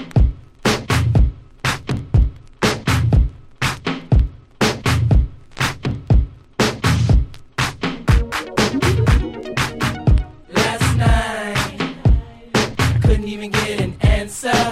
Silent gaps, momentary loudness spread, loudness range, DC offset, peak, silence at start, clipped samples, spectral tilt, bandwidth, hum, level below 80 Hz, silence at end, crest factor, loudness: none; 6 LU; 1 LU; under 0.1%; -2 dBFS; 0 s; under 0.1%; -5.5 dB/octave; 15 kHz; none; -22 dBFS; 0 s; 14 dB; -19 LUFS